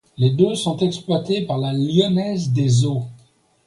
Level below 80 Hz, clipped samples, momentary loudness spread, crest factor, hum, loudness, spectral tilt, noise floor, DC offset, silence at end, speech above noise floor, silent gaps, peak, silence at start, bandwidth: -56 dBFS; under 0.1%; 5 LU; 16 dB; none; -20 LUFS; -6.5 dB/octave; -55 dBFS; under 0.1%; 0.5 s; 36 dB; none; -2 dBFS; 0.2 s; 11.5 kHz